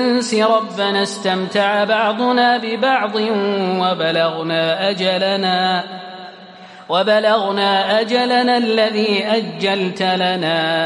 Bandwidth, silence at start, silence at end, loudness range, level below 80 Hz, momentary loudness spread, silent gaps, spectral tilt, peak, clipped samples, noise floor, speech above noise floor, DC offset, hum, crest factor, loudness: 11.5 kHz; 0 s; 0 s; 2 LU; -72 dBFS; 4 LU; none; -4.5 dB/octave; -2 dBFS; under 0.1%; -38 dBFS; 22 dB; under 0.1%; none; 14 dB; -16 LUFS